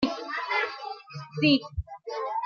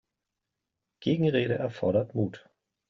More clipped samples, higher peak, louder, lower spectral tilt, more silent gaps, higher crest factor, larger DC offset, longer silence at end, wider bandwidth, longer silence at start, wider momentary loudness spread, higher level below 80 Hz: neither; about the same, -10 dBFS vs -12 dBFS; about the same, -28 LUFS vs -28 LUFS; about the same, -6 dB/octave vs -6.5 dB/octave; neither; about the same, 18 dB vs 18 dB; neither; second, 0 s vs 0.5 s; about the same, 7 kHz vs 7.2 kHz; second, 0 s vs 1 s; first, 16 LU vs 8 LU; first, -48 dBFS vs -66 dBFS